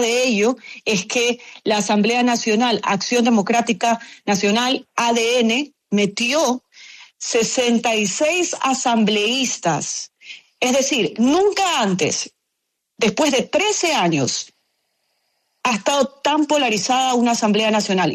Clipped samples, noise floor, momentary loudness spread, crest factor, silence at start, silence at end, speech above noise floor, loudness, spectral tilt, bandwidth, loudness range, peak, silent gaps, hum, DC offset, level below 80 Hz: under 0.1%; -76 dBFS; 6 LU; 14 dB; 0 s; 0 s; 58 dB; -18 LUFS; -3 dB/octave; 13.5 kHz; 2 LU; -4 dBFS; none; none; under 0.1%; -62 dBFS